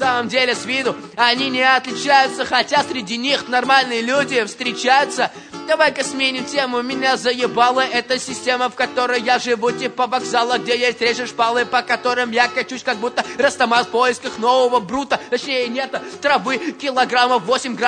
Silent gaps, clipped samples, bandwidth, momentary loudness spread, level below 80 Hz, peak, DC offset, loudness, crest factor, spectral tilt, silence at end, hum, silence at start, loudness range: none; under 0.1%; 9.6 kHz; 7 LU; -62 dBFS; 0 dBFS; under 0.1%; -18 LUFS; 18 dB; -2.5 dB/octave; 0 s; none; 0 s; 2 LU